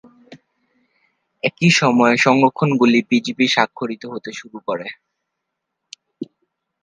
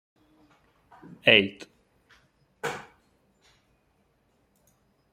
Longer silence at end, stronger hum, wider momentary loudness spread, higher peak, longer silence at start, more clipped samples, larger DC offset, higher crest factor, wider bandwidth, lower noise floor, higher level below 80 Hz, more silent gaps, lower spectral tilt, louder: second, 0.6 s vs 2.3 s; neither; second, 20 LU vs 28 LU; about the same, 0 dBFS vs -2 dBFS; second, 0.3 s vs 1.25 s; neither; neither; second, 20 dB vs 30 dB; second, 9.8 kHz vs 16 kHz; first, -78 dBFS vs -69 dBFS; about the same, -66 dBFS vs -70 dBFS; neither; about the same, -5 dB/octave vs -4 dB/octave; first, -16 LUFS vs -23 LUFS